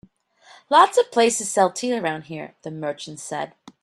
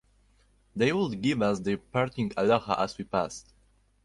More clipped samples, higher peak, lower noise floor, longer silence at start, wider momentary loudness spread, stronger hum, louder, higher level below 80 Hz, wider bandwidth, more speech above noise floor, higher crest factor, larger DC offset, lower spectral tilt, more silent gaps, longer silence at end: neither; first, -2 dBFS vs -10 dBFS; second, -53 dBFS vs -65 dBFS; about the same, 0.7 s vs 0.75 s; first, 18 LU vs 6 LU; neither; first, -21 LUFS vs -28 LUFS; second, -70 dBFS vs -58 dBFS; first, 13.5 kHz vs 11.5 kHz; second, 32 dB vs 37 dB; about the same, 20 dB vs 20 dB; neither; second, -3 dB/octave vs -6 dB/octave; neither; second, 0.35 s vs 0.65 s